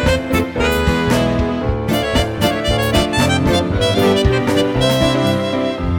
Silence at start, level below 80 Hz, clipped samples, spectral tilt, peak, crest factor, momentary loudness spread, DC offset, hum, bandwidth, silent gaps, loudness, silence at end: 0 s; -26 dBFS; under 0.1%; -5.5 dB/octave; 0 dBFS; 14 dB; 4 LU; under 0.1%; none; 19 kHz; none; -16 LUFS; 0 s